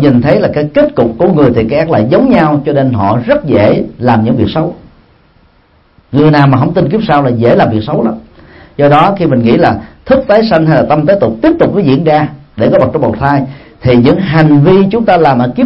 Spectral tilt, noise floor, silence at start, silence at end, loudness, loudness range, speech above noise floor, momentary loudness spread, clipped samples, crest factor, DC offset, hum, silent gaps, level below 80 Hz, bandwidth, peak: -10 dB/octave; -47 dBFS; 0 s; 0 s; -9 LUFS; 3 LU; 40 dB; 6 LU; 0.4%; 8 dB; under 0.1%; none; none; -36 dBFS; 5.8 kHz; 0 dBFS